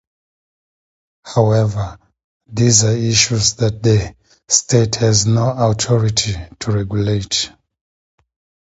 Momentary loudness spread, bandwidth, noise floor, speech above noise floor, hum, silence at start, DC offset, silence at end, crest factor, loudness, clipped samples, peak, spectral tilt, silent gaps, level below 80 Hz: 10 LU; 8 kHz; under -90 dBFS; over 75 dB; none; 1.25 s; under 0.1%; 1.2 s; 18 dB; -15 LUFS; under 0.1%; 0 dBFS; -4 dB/octave; 2.24-2.40 s; -40 dBFS